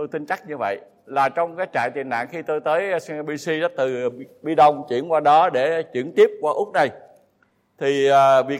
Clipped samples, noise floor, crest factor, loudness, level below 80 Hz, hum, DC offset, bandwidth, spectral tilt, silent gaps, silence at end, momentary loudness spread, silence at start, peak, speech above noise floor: under 0.1%; -64 dBFS; 16 dB; -21 LUFS; -74 dBFS; none; under 0.1%; 13.5 kHz; -5 dB/octave; none; 0 s; 12 LU; 0 s; -4 dBFS; 44 dB